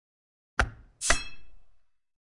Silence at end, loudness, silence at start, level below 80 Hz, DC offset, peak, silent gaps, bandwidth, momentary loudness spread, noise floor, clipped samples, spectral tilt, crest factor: 0.65 s; -30 LUFS; 0.6 s; -42 dBFS; under 0.1%; -10 dBFS; none; 11.5 kHz; 7 LU; -59 dBFS; under 0.1%; -1.5 dB/octave; 24 dB